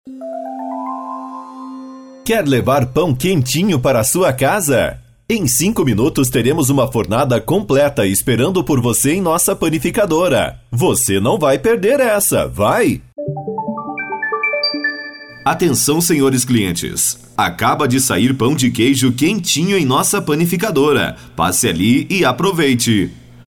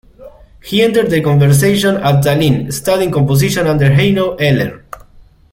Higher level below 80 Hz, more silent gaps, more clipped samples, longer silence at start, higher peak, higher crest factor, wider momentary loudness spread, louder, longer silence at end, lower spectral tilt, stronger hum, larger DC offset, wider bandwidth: about the same, -42 dBFS vs -38 dBFS; neither; neither; second, 0.05 s vs 0.2 s; second, -4 dBFS vs 0 dBFS; about the same, 12 dB vs 12 dB; first, 11 LU vs 6 LU; second, -15 LUFS vs -12 LUFS; second, 0.1 s vs 0.75 s; second, -4.5 dB/octave vs -6 dB/octave; neither; first, 0.2% vs under 0.1%; first, over 20 kHz vs 16.5 kHz